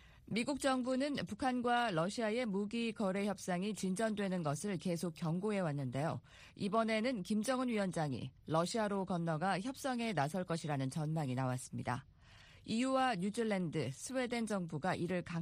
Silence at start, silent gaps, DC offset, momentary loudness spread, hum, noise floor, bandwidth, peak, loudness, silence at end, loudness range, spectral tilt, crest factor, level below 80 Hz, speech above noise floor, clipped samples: 0 s; none; under 0.1%; 6 LU; none; -61 dBFS; 15 kHz; -20 dBFS; -38 LUFS; 0 s; 2 LU; -5.5 dB/octave; 18 dB; -68 dBFS; 24 dB; under 0.1%